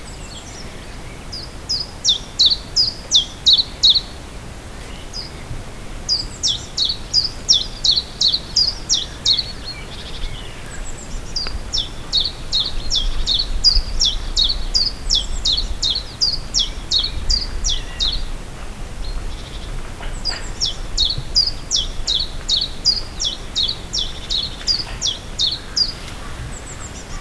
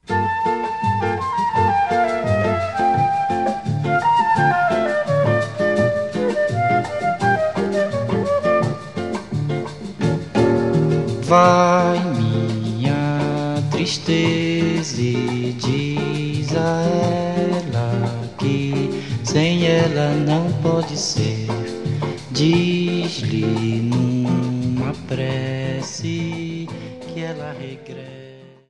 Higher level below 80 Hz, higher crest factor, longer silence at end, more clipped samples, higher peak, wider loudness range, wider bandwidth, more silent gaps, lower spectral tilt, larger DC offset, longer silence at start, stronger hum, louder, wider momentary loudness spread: first, -28 dBFS vs -52 dBFS; about the same, 18 dB vs 20 dB; second, 0 s vs 0.15 s; neither; about the same, -2 dBFS vs 0 dBFS; first, 7 LU vs 4 LU; about the same, 11 kHz vs 11 kHz; neither; second, -1.5 dB/octave vs -6 dB/octave; about the same, 0.4% vs 0.4%; about the same, 0 s vs 0.05 s; neither; about the same, -17 LUFS vs -19 LUFS; first, 19 LU vs 9 LU